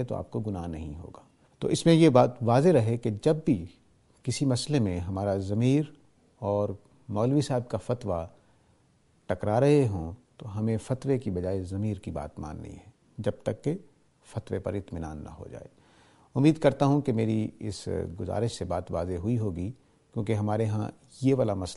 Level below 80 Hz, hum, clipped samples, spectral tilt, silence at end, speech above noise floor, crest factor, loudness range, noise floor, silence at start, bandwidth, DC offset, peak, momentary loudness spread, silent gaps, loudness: -52 dBFS; none; under 0.1%; -7 dB/octave; 0 s; 38 dB; 22 dB; 10 LU; -65 dBFS; 0 s; 11.5 kHz; under 0.1%; -6 dBFS; 17 LU; none; -28 LUFS